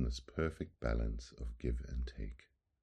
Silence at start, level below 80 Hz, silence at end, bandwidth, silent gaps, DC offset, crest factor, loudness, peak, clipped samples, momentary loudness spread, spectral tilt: 0 s; -42 dBFS; 0.45 s; 9.2 kHz; none; under 0.1%; 18 dB; -42 LUFS; -22 dBFS; under 0.1%; 10 LU; -6.5 dB/octave